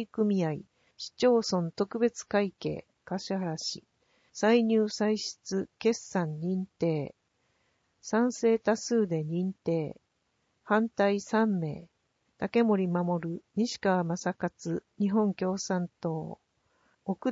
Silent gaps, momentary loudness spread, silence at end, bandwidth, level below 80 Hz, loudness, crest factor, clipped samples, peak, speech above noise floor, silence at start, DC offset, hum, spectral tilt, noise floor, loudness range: none; 12 LU; 0 s; 8 kHz; -70 dBFS; -30 LUFS; 18 dB; under 0.1%; -12 dBFS; 47 dB; 0 s; under 0.1%; none; -5.5 dB/octave; -76 dBFS; 2 LU